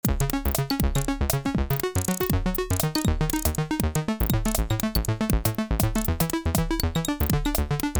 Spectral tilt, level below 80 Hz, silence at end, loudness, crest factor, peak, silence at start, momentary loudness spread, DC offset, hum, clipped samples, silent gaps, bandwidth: -5 dB/octave; -30 dBFS; 0 s; -25 LUFS; 16 dB; -8 dBFS; 0.05 s; 2 LU; under 0.1%; none; under 0.1%; none; over 20 kHz